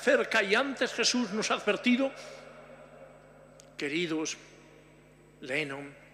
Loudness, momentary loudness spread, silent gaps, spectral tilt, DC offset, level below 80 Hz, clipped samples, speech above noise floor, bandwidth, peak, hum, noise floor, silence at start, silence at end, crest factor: -29 LUFS; 22 LU; none; -3 dB/octave; under 0.1%; -70 dBFS; under 0.1%; 27 dB; 14.5 kHz; -10 dBFS; 50 Hz at -65 dBFS; -57 dBFS; 0 s; 0.2 s; 20 dB